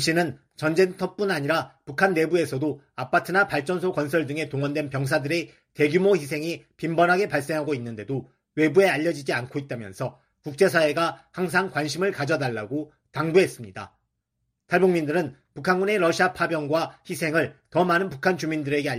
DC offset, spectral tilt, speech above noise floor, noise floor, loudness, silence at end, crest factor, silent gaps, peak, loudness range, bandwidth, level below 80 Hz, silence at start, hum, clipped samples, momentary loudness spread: under 0.1%; -5.5 dB/octave; 54 dB; -78 dBFS; -24 LUFS; 0 s; 18 dB; none; -6 dBFS; 2 LU; 15.5 kHz; -64 dBFS; 0 s; none; under 0.1%; 12 LU